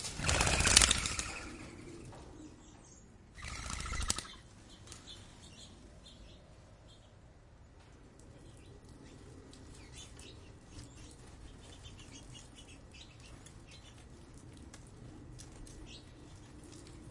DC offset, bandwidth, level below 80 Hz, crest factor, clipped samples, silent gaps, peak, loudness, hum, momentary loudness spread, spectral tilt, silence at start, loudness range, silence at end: under 0.1%; 11.5 kHz; -50 dBFS; 36 dB; under 0.1%; none; -4 dBFS; -31 LUFS; none; 24 LU; -1.5 dB/octave; 0 s; 24 LU; 0 s